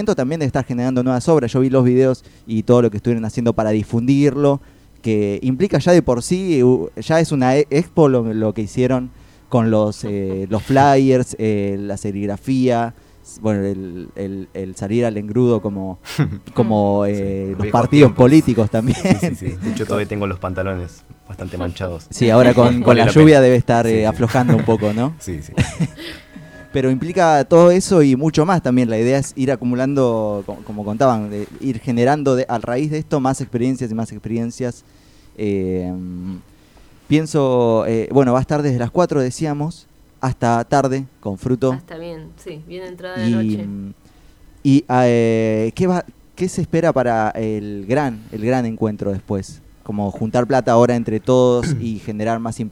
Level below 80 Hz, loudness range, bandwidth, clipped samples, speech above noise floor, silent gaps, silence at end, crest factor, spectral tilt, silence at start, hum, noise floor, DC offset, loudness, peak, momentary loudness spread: -44 dBFS; 8 LU; 15 kHz; under 0.1%; 30 dB; none; 0 s; 16 dB; -7 dB/octave; 0 s; none; -47 dBFS; under 0.1%; -17 LUFS; 0 dBFS; 14 LU